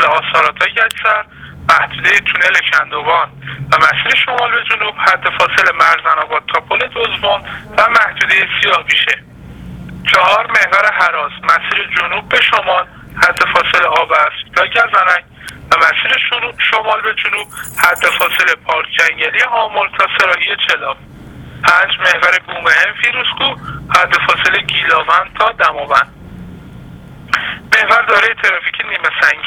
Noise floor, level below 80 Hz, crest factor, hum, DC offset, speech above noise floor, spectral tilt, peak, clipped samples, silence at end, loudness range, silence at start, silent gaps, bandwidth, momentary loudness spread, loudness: -33 dBFS; -44 dBFS; 14 dB; none; under 0.1%; 20 dB; -2 dB/octave; 0 dBFS; 0.2%; 0 s; 2 LU; 0 s; none; over 20 kHz; 7 LU; -11 LUFS